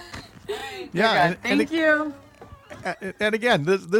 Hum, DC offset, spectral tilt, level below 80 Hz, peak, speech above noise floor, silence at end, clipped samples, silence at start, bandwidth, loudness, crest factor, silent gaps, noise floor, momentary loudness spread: none; under 0.1%; -5 dB/octave; -58 dBFS; -8 dBFS; 23 dB; 0 s; under 0.1%; 0 s; 17 kHz; -23 LUFS; 16 dB; none; -44 dBFS; 14 LU